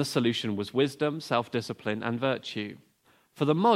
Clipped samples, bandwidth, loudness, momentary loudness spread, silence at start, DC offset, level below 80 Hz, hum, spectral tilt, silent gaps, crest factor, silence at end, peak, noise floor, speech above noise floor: under 0.1%; 16 kHz; -29 LUFS; 7 LU; 0 s; under 0.1%; -72 dBFS; none; -5.5 dB/octave; none; 18 dB; 0 s; -10 dBFS; -65 dBFS; 37 dB